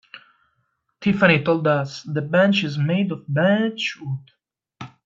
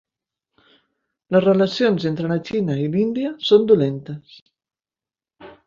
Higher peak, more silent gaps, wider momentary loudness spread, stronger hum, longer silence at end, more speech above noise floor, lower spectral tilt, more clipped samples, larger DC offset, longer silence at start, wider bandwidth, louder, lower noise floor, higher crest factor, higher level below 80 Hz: about the same, -2 dBFS vs -2 dBFS; second, none vs 4.42-4.46 s; first, 15 LU vs 9 LU; neither; about the same, 0.2 s vs 0.15 s; second, 51 dB vs over 72 dB; about the same, -6.5 dB/octave vs -7.5 dB/octave; neither; neither; second, 0.15 s vs 1.3 s; about the same, 7.6 kHz vs 7.4 kHz; about the same, -20 LUFS vs -19 LUFS; second, -71 dBFS vs under -90 dBFS; about the same, 20 dB vs 18 dB; about the same, -60 dBFS vs -60 dBFS